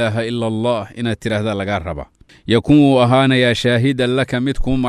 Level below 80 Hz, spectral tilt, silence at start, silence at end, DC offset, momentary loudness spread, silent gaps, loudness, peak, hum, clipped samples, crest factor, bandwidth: -34 dBFS; -6.5 dB/octave; 0 s; 0 s; under 0.1%; 11 LU; none; -16 LUFS; -2 dBFS; none; under 0.1%; 14 dB; 12 kHz